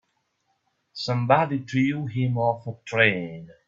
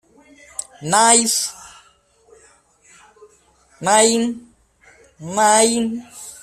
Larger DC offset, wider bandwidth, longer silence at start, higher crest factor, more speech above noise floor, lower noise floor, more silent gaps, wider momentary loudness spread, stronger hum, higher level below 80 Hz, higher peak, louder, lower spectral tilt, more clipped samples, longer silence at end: neither; second, 7.6 kHz vs 15 kHz; first, 0.95 s vs 0.8 s; about the same, 22 dB vs 20 dB; first, 49 dB vs 39 dB; first, -73 dBFS vs -55 dBFS; neither; second, 12 LU vs 22 LU; neither; about the same, -64 dBFS vs -62 dBFS; about the same, -2 dBFS vs 0 dBFS; second, -24 LUFS vs -16 LUFS; first, -7 dB/octave vs -2 dB/octave; neither; about the same, 0.15 s vs 0.1 s